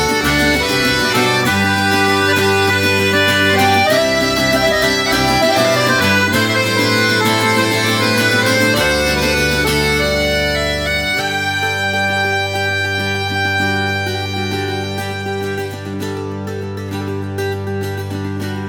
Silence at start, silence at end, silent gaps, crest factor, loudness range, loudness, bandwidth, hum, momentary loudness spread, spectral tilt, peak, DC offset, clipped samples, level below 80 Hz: 0 s; 0 s; none; 14 dB; 9 LU; -15 LUFS; 19 kHz; none; 10 LU; -4 dB/octave; -2 dBFS; under 0.1%; under 0.1%; -36 dBFS